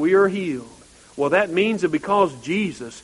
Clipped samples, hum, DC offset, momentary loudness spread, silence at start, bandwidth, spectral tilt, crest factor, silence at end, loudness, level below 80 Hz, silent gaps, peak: under 0.1%; none; under 0.1%; 10 LU; 0 s; 11.5 kHz; -5.5 dB/octave; 18 dB; 0 s; -21 LUFS; -58 dBFS; none; -4 dBFS